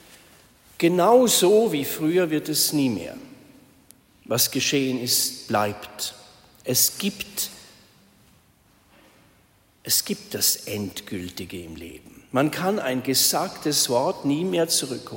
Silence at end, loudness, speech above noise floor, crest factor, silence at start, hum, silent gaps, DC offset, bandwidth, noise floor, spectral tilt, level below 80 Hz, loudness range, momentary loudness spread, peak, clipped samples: 0 s; -22 LUFS; 36 dB; 20 dB; 0.8 s; none; none; under 0.1%; 16.5 kHz; -59 dBFS; -3 dB/octave; -62 dBFS; 7 LU; 16 LU; -6 dBFS; under 0.1%